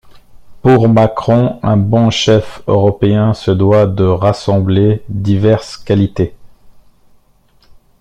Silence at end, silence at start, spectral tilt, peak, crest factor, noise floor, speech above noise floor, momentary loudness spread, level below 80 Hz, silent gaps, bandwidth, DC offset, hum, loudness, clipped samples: 1.3 s; 0.15 s; -7.5 dB/octave; 0 dBFS; 12 dB; -50 dBFS; 39 dB; 6 LU; -40 dBFS; none; 9 kHz; under 0.1%; none; -12 LUFS; under 0.1%